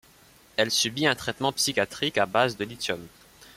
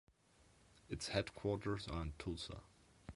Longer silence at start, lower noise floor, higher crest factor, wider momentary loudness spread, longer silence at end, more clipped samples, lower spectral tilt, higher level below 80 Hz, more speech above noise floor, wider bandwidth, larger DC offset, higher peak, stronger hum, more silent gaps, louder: first, 0.6 s vs 0.4 s; second, -56 dBFS vs -71 dBFS; about the same, 20 dB vs 24 dB; about the same, 8 LU vs 10 LU; about the same, 0.1 s vs 0 s; neither; second, -2.5 dB/octave vs -5 dB/octave; second, -62 dBFS vs -56 dBFS; about the same, 29 dB vs 28 dB; first, 16.5 kHz vs 11.5 kHz; neither; first, -8 dBFS vs -20 dBFS; neither; neither; first, -26 LUFS vs -44 LUFS